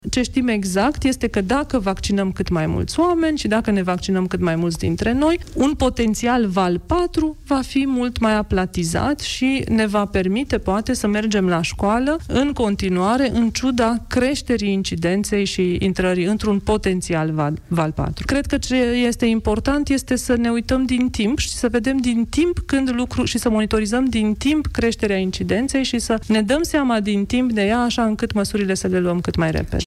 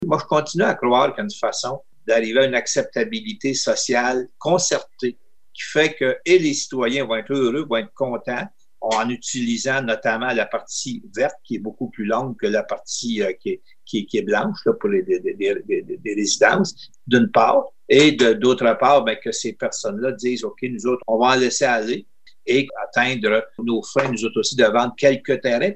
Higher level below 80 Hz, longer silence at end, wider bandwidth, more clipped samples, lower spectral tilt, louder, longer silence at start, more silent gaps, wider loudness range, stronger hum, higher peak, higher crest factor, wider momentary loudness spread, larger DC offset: first, -34 dBFS vs -68 dBFS; about the same, 0 s vs 0 s; first, 14.5 kHz vs 9.2 kHz; neither; first, -5.5 dB/octave vs -3.5 dB/octave; about the same, -20 LUFS vs -20 LUFS; about the same, 0.05 s vs 0 s; neither; second, 1 LU vs 6 LU; neither; second, -8 dBFS vs -2 dBFS; second, 12 dB vs 18 dB; second, 3 LU vs 11 LU; second, under 0.1% vs 0.6%